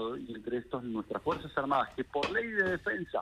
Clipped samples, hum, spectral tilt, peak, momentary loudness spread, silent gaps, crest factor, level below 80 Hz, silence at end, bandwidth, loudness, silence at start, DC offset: under 0.1%; none; -6 dB/octave; -16 dBFS; 7 LU; none; 18 dB; -60 dBFS; 0 s; 12.5 kHz; -33 LUFS; 0 s; under 0.1%